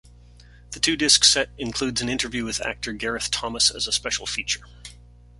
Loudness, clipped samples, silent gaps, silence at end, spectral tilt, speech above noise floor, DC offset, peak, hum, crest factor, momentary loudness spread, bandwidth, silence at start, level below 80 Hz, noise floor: -21 LUFS; under 0.1%; none; 0.45 s; -1 dB/octave; 24 dB; under 0.1%; 0 dBFS; 60 Hz at -45 dBFS; 24 dB; 13 LU; 11.5 kHz; 0.05 s; -46 dBFS; -48 dBFS